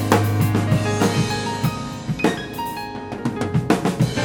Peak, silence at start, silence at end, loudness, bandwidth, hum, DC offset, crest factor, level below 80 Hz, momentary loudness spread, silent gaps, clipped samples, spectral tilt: 0 dBFS; 0 s; 0 s; -21 LUFS; 18 kHz; none; under 0.1%; 20 dB; -44 dBFS; 9 LU; none; under 0.1%; -6 dB/octave